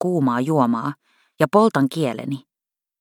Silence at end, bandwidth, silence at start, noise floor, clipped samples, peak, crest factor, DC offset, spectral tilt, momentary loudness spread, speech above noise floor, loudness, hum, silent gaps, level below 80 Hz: 0.6 s; 17.5 kHz; 0 s; -89 dBFS; under 0.1%; -2 dBFS; 20 dB; under 0.1%; -7 dB/octave; 14 LU; 69 dB; -20 LUFS; none; none; -66 dBFS